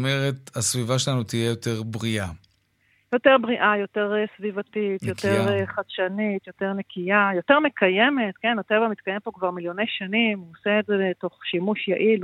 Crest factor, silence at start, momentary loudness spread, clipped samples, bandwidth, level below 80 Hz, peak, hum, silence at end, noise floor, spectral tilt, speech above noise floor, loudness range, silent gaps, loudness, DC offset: 22 dB; 0 s; 10 LU; under 0.1%; 15.5 kHz; -62 dBFS; -2 dBFS; none; 0 s; -65 dBFS; -4.5 dB/octave; 42 dB; 3 LU; none; -23 LUFS; under 0.1%